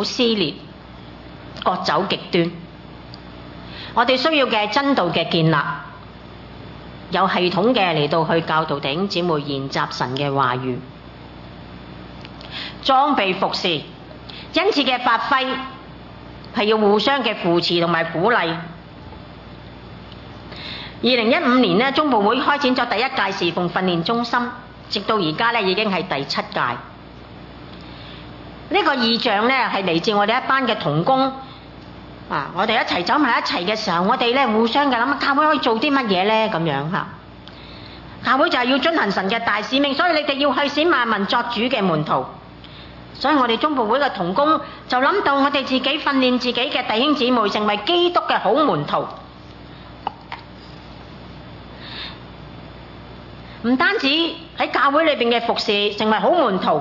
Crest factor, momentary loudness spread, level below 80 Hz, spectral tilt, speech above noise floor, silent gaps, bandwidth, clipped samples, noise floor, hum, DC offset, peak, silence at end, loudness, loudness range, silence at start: 18 dB; 22 LU; -50 dBFS; -5.5 dB/octave; 21 dB; none; 6 kHz; under 0.1%; -39 dBFS; none; under 0.1%; -2 dBFS; 0 s; -18 LUFS; 6 LU; 0 s